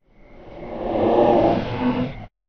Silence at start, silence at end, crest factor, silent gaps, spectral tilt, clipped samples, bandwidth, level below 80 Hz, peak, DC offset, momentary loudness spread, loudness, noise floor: 0.3 s; 0.2 s; 18 dB; none; -6 dB/octave; under 0.1%; 6.4 kHz; -40 dBFS; -4 dBFS; under 0.1%; 15 LU; -20 LUFS; -44 dBFS